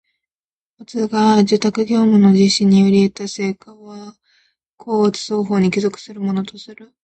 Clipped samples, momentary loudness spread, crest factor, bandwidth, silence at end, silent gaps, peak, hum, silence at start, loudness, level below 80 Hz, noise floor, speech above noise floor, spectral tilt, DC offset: under 0.1%; 18 LU; 14 dB; 8.8 kHz; 0.2 s; 4.70-4.78 s; -2 dBFS; none; 0.8 s; -16 LUFS; -58 dBFS; under -90 dBFS; over 74 dB; -6 dB/octave; under 0.1%